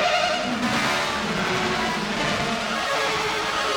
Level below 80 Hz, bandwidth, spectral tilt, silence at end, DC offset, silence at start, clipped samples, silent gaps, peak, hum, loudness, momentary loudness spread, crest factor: -48 dBFS; over 20 kHz; -3 dB/octave; 0 s; under 0.1%; 0 s; under 0.1%; none; -8 dBFS; none; -23 LUFS; 2 LU; 16 dB